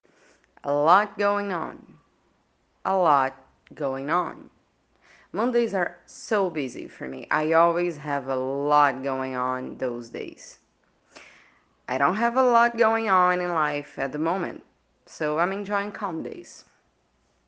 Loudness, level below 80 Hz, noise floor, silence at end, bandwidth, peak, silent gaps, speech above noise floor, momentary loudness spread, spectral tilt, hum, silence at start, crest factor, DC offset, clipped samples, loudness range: -24 LUFS; -70 dBFS; -68 dBFS; 0.85 s; 9.4 kHz; -4 dBFS; none; 43 dB; 16 LU; -5.5 dB/octave; none; 0.65 s; 22 dB; under 0.1%; under 0.1%; 6 LU